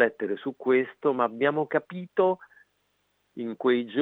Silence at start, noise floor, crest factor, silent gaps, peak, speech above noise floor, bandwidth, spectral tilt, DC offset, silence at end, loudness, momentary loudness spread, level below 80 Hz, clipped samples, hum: 0 s; -73 dBFS; 20 dB; none; -6 dBFS; 46 dB; 4 kHz; -8.5 dB/octave; under 0.1%; 0 s; -27 LUFS; 10 LU; -84 dBFS; under 0.1%; 50 Hz at -65 dBFS